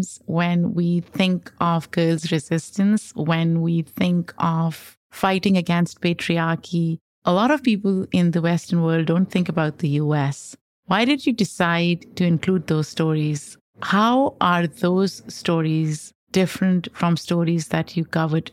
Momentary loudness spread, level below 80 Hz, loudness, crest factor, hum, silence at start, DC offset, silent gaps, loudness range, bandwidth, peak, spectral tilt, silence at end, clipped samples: 6 LU; -60 dBFS; -21 LUFS; 16 dB; none; 0 s; under 0.1%; 4.97-5.10 s, 7.01-7.22 s, 10.61-10.83 s, 13.61-13.73 s, 16.15-16.27 s; 1 LU; 14 kHz; -6 dBFS; -6.5 dB/octave; 0 s; under 0.1%